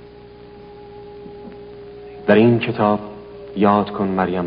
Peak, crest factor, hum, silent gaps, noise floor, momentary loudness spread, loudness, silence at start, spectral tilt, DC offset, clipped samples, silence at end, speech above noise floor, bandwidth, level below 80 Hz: 0 dBFS; 20 dB; 60 Hz at -40 dBFS; none; -41 dBFS; 24 LU; -17 LUFS; 0.05 s; -6 dB/octave; under 0.1%; under 0.1%; 0 s; 25 dB; 5.2 kHz; -52 dBFS